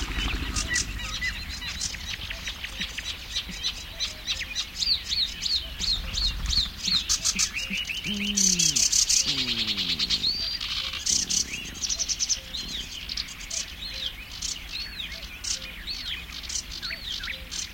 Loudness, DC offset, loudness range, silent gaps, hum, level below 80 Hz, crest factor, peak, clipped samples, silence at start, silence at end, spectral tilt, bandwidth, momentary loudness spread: -26 LUFS; under 0.1%; 10 LU; none; none; -40 dBFS; 20 dB; -8 dBFS; under 0.1%; 0 s; 0 s; -0.5 dB/octave; 17 kHz; 12 LU